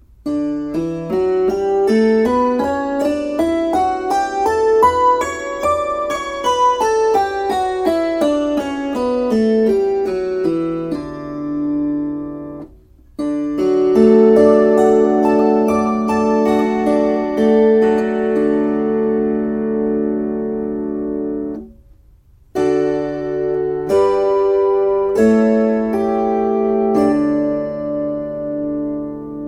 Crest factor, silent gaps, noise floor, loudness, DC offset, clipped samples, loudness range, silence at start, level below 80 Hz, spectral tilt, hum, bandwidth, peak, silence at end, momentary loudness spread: 16 dB; none; -48 dBFS; -16 LUFS; under 0.1%; under 0.1%; 8 LU; 0.25 s; -46 dBFS; -6.5 dB/octave; none; 14.5 kHz; 0 dBFS; 0 s; 10 LU